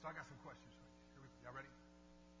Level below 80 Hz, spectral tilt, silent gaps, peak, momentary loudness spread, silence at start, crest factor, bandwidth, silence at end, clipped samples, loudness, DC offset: -72 dBFS; -5 dB/octave; none; -36 dBFS; 12 LU; 0 s; 20 dB; 8 kHz; 0 s; under 0.1%; -58 LUFS; under 0.1%